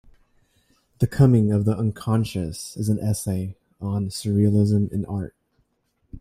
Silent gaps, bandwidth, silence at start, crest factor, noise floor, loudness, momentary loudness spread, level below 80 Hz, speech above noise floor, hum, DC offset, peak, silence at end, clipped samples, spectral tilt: none; 15 kHz; 1 s; 20 dB; -70 dBFS; -23 LUFS; 13 LU; -48 dBFS; 48 dB; none; under 0.1%; -4 dBFS; 0 s; under 0.1%; -7.5 dB/octave